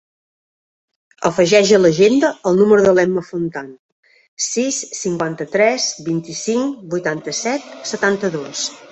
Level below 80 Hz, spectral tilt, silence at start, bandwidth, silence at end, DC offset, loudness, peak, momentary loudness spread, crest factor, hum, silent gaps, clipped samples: -58 dBFS; -4 dB/octave; 1.2 s; 8.4 kHz; 0.15 s; under 0.1%; -17 LUFS; -2 dBFS; 12 LU; 16 dB; none; 3.79-4.03 s, 4.28-4.37 s; under 0.1%